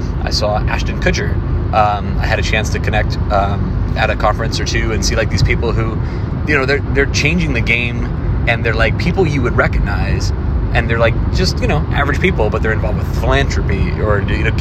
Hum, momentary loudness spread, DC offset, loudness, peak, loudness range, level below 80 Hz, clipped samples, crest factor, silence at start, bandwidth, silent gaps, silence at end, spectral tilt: none; 4 LU; under 0.1%; -15 LUFS; 0 dBFS; 1 LU; -20 dBFS; under 0.1%; 14 dB; 0 s; 13 kHz; none; 0 s; -5.5 dB/octave